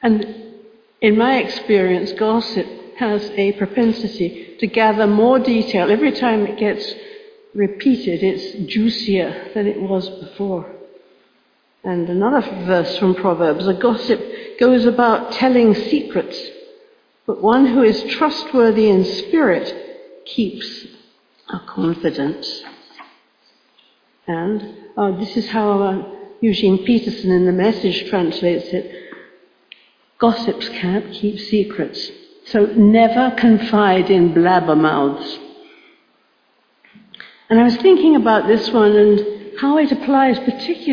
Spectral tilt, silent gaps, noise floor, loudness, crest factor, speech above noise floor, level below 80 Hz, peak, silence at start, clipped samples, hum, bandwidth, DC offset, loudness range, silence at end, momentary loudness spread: -7.5 dB/octave; none; -60 dBFS; -16 LUFS; 16 dB; 44 dB; -56 dBFS; -2 dBFS; 0 s; under 0.1%; none; 5.2 kHz; under 0.1%; 9 LU; 0 s; 14 LU